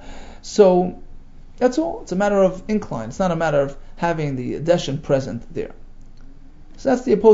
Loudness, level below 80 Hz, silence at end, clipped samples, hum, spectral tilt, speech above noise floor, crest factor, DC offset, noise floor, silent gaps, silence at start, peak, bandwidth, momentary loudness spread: -20 LUFS; -38 dBFS; 0 s; under 0.1%; none; -6.5 dB/octave; 20 dB; 18 dB; under 0.1%; -39 dBFS; none; 0 s; -2 dBFS; 8 kHz; 14 LU